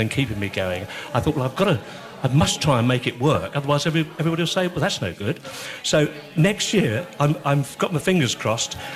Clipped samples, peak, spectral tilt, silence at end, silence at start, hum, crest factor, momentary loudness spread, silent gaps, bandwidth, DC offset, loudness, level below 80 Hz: under 0.1%; -6 dBFS; -5 dB/octave; 0 s; 0 s; none; 16 dB; 7 LU; none; 14.5 kHz; under 0.1%; -22 LUFS; -50 dBFS